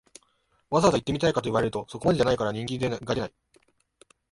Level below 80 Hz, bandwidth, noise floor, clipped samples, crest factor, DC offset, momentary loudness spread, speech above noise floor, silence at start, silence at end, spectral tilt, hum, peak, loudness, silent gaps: -52 dBFS; 11.5 kHz; -69 dBFS; under 0.1%; 20 dB; under 0.1%; 8 LU; 43 dB; 0.7 s; 1.05 s; -5.5 dB/octave; none; -6 dBFS; -26 LUFS; none